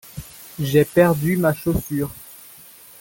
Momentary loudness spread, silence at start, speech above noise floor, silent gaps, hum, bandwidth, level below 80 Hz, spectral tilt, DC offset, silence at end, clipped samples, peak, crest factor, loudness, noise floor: 22 LU; 0.15 s; 26 dB; none; none; 17 kHz; -44 dBFS; -6.5 dB/octave; under 0.1%; 0.65 s; under 0.1%; -2 dBFS; 18 dB; -20 LUFS; -45 dBFS